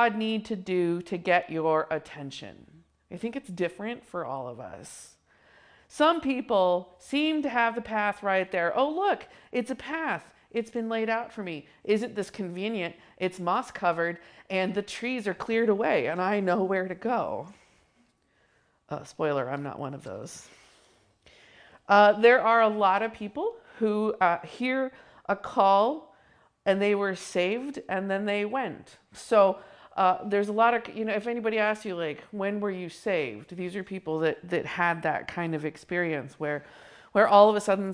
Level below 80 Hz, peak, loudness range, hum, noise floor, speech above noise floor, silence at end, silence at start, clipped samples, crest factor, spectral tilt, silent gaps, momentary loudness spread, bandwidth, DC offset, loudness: -68 dBFS; -6 dBFS; 10 LU; none; -68 dBFS; 41 dB; 0 s; 0 s; under 0.1%; 22 dB; -5.5 dB/octave; none; 15 LU; 10.5 kHz; under 0.1%; -27 LUFS